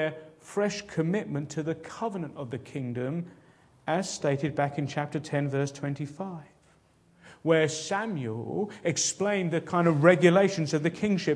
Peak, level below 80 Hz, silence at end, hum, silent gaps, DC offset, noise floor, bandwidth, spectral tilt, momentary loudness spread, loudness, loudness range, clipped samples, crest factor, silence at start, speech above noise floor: -4 dBFS; -68 dBFS; 0 s; none; none; under 0.1%; -62 dBFS; 11 kHz; -5.5 dB/octave; 15 LU; -28 LUFS; 8 LU; under 0.1%; 24 dB; 0 s; 35 dB